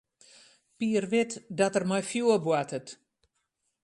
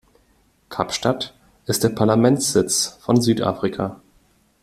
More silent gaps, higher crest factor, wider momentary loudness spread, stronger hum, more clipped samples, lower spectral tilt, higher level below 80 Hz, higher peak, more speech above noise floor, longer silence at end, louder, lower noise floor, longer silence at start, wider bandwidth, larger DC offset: neither; about the same, 18 dB vs 18 dB; about the same, 10 LU vs 12 LU; neither; neither; about the same, -5 dB/octave vs -4.5 dB/octave; second, -74 dBFS vs -54 dBFS; second, -12 dBFS vs -2 dBFS; first, 51 dB vs 41 dB; first, 0.9 s vs 0.65 s; second, -28 LUFS vs -20 LUFS; first, -79 dBFS vs -60 dBFS; about the same, 0.8 s vs 0.7 s; second, 11.5 kHz vs 16 kHz; neither